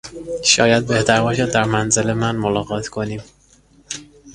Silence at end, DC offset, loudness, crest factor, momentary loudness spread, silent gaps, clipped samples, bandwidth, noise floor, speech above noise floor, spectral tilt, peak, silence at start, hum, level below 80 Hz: 0 s; under 0.1%; -17 LUFS; 18 dB; 17 LU; none; under 0.1%; 11.5 kHz; -52 dBFS; 34 dB; -3.5 dB/octave; 0 dBFS; 0.05 s; none; -46 dBFS